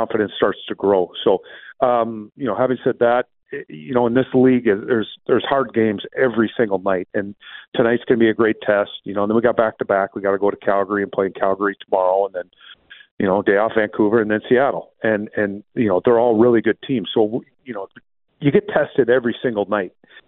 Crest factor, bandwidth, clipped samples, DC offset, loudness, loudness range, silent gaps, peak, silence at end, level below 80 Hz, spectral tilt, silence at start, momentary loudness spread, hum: 16 dB; 4.1 kHz; under 0.1%; under 0.1%; -19 LUFS; 2 LU; 7.68-7.72 s, 13.11-13.17 s; -2 dBFS; 0.1 s; -58 dBFS; -11 dB/octave; 0 s; 11 LU; none